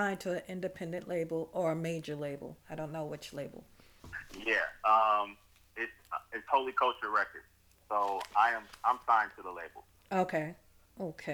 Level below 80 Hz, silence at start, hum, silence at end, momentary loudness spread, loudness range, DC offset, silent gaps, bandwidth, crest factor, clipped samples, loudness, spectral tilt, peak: -66 dBFS; 0 s; none; 0 s; 15 LU; 7 LU; under 0.1%; none; over 20 kHz; 22 dB; under 0.1%; -33 LUFS; -5 dB/octave; -14 dBFS